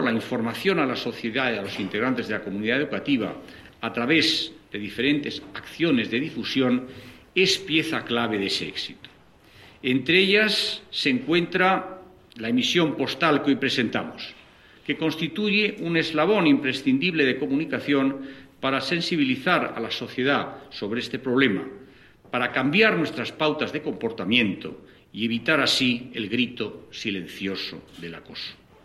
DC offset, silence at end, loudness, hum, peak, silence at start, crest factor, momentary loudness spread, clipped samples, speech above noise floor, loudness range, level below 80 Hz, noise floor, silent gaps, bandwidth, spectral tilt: under 0.1%; 0.3 s; -24 LUFS; none; -4 dBFS; 0 s; 20 dB; 15 LU; under 0.1%; 28 dB; 3 LU; -62 dBFS; -52 dBFS; none; 13 kHz; -4.5 dB/octave